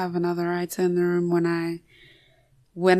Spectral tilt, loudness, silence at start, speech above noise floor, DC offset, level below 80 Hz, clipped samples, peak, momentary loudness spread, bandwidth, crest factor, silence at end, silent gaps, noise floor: -6.5 dB/octave; -25 LUFS; 0 s; 36 dB; under 0.1%; -68 dBFS; under 0.1%; -6 dBFS; 10 LU; 13 kHz; 18 dB; 0 s; none; -60 dBFS